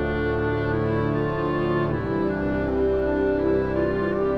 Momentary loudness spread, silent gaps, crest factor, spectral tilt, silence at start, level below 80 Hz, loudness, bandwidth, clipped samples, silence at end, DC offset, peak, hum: 2 LU; none; 12 dB; -9.5 dB/octave; 0 s; -38 dBFS; -24 LUFS; 6 kHz; under 0.1%; 0 s; under 0.1%; -12 dBFS; none